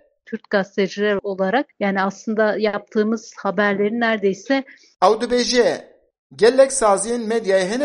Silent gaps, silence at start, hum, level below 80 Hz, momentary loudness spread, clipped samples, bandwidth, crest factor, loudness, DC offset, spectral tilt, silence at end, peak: 6.19-6.30 s; 0.3 s; none; -56 dBFS; 7 LU; under 0.1%; 11.5 kHz; 18 dB; -19 LUFS; under 0.1%; -4 dB/octave; 0 s; -2 dBFS